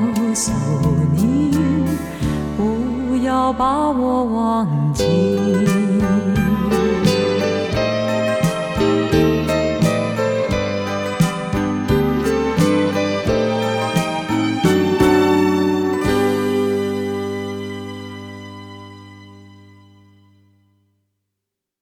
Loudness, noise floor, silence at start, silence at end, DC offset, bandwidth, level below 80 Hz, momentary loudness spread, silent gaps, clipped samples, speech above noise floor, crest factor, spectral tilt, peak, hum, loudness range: -18 LUFS; -81 dBFS; 0 s; 2.35 s; under 0.1%; 18.5 kHz; -36 dBFS; 7 LU; none; under 0.1%; 64 dB; 16 dB; -6 dB/octave; -2 dBFS; none; 6 LU